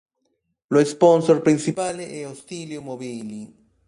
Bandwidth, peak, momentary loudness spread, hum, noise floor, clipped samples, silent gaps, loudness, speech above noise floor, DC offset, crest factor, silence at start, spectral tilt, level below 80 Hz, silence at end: 11.5 kHz; -4 dBFS; 18 LU; none; -73 dBFS; under 0.1%; none; -19 LUFS; 52 dB; under 0.1%; 18 dB; 0.7 s; -6 dB/octave; -66 dBFS; 0.4 s